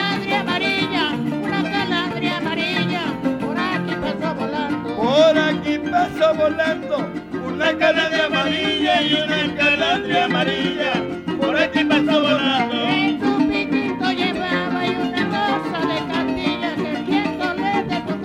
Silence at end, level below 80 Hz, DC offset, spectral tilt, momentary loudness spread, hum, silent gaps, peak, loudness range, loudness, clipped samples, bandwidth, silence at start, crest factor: 0 s; -52 dBFS; under 0.1%; -5.5 dB/octave; 7 LU; none; none; -4 dBFS; 3 LU; -19 LUFS; under 0.1%; 11.5 kHz; 0 s; 16 dB